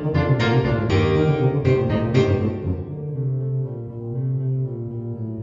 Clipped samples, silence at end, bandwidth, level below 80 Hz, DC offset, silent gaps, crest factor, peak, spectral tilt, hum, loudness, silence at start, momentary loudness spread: under 0.1%; 0 s; 7.2 kHz; -40 dBFS; under 0.1%; none; 16 dB; -4 dBFS; -8.5 dB/octave; none; -22 LUFS; 0 s; 11 LU